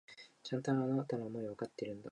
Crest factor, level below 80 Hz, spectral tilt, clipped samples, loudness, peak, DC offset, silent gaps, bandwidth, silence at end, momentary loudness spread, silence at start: 16 dB; -80 dBFS; -7 dB/octave; under 0.1%; -39 LUFS; -22 dBFS; under 0.1%; none; 10.5 kHz; 0 s; 12 LU; 0.1 s